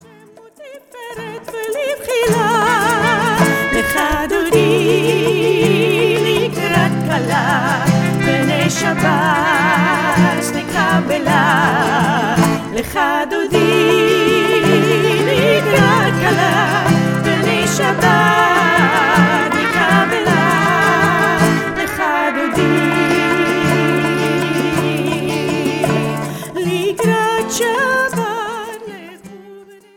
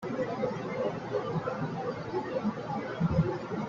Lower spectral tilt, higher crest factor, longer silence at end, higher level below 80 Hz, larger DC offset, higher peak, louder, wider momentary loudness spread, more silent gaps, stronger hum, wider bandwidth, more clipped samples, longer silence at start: second, -5 dB/octave vs -8 dB/octave; about the same, 14 dB vs 18 dB; first, 0.35 s vs 0 s; first, -42 dBFS vs -56 dBFS; neither; first, 0 dBFS vs -14 dBFS; first, -14 LUFS vs -33 LUFS; about the same, 7 LU vs 6 LU; neither; neither; first, 18 kHz vs 7.4 kHz; neither; first, 0.6 s vs 0 s